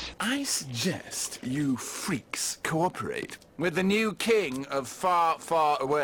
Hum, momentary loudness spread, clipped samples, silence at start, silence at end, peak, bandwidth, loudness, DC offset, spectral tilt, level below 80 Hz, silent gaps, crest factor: none; 7 LU; under 0.1%; 0 s; 0 s; -14 dBFS; 18 kHz; -28 LUFS; under 0.1%; -3.5 dB/octave; -60 dBFS; none; 14 dB